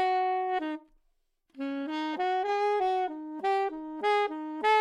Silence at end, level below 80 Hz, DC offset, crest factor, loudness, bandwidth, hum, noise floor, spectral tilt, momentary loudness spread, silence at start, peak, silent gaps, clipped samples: 0 s; -72 dBFS; under 0.1%; 16 dB; -30 LUFS; 11.5 kHz; none; -73 dBFS; -3 dB/octave; 8 LU; 0 s; -14 dBFS; none; under 0.1%